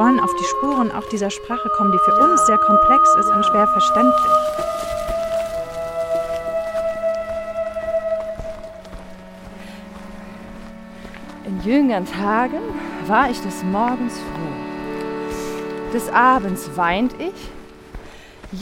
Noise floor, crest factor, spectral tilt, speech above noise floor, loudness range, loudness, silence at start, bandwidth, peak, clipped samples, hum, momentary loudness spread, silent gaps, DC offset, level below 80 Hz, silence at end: -39 dBFS; 18 dB; -5 dB/octave; 22 dB; 14 LU; -19 LUFS; 0 s; 16.5 kHz; -2 dBFS; under 0.1%; none; 23 LU; none; under 0.1%; -42 dBFS; 0 s